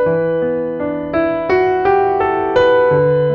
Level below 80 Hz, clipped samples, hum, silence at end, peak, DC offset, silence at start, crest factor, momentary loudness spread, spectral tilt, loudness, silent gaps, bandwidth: -44 dBFS; under 0.1%; none; 0 s; -2 dBFS; under 0.1%; 0 s; 12 dB; 7 LU; -8 dB/octave; -15 LUFS; none; 6.8 kHz